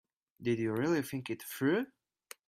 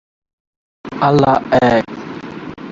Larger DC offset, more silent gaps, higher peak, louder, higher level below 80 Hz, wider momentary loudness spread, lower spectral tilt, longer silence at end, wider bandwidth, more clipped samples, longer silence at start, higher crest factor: neither; neither; second, -20 dBFS vs 0 dBFS; second, -34 LUFS vs -14 LUFS; second, -74 dBFS vs -46 dBFS; second, 10 LU vs 17 LU; about the same, -6 dB/octave vs -7 dB/octave; first, 0.6 s vs 0 s; first, 16 kHz vs 7.8 kHz; neither; second, 0.4 s vs 0.85 s; about the same, 16 dB vs 16 dB